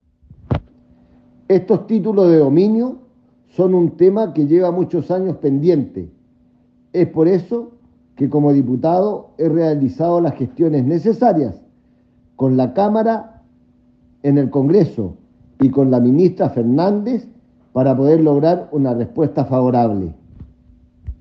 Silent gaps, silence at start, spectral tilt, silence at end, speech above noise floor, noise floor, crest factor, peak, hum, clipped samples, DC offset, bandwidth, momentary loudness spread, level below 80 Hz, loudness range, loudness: none; 0.5 s; -11 dB/octave; 0.05 s; 39 dB; -54 dBFS; 16 dB; -2 dBFS; none; under 0.1%; under 0.1%; 6 kHz; 11 LU; -48 dBFS; 4 LU; -16 LUFS